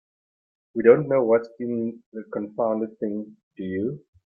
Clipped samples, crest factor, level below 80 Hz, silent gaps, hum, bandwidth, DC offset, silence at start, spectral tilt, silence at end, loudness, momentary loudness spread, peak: under 0.1%; 22 dB; -68 dBFS; 2.06-2.12 s, 3.43-3.51 s; none; 4.8 kHz; under 0.1%; 0.75 s; -11 dB/octave; 0.35 s; -24 LUFS; 17 LU; -2 dBFS